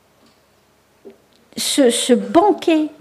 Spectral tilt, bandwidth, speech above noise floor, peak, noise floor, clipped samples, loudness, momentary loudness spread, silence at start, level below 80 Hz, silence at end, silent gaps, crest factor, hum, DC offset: -3 dB/octave; 15.5 kHz; 42 dB; 0 dBFS; -56 dBFS; under 0.1%; -15 LUFS; 8 LU; 1.05 s; -62 dBFS; 0.1 s; none; 18 dB; none; under 0.1%